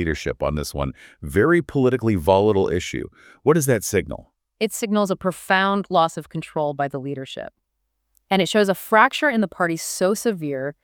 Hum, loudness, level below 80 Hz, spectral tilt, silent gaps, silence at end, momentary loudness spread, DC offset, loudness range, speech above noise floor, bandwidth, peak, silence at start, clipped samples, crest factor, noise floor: none; -21 LUFS; -44 dBFS; -5 dB/octave; none; 0.1 s; 13 LU; under 0.1%; 3 LU; 54 dB; over 20 kHz; -2 dBFS; 0 s; under 0.1%; 20 dB; -74 dBFS